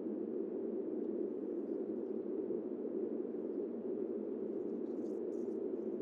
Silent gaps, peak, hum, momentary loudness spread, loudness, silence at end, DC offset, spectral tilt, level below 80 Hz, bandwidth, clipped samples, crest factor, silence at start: none; -28 dBFS; none; 1 LU; -41 LUFS; 0 s; under 0.1%; -10 dB/octave; under -90 dBFS; 3.2 kHz; under 0.1%; 12 dB; 0 s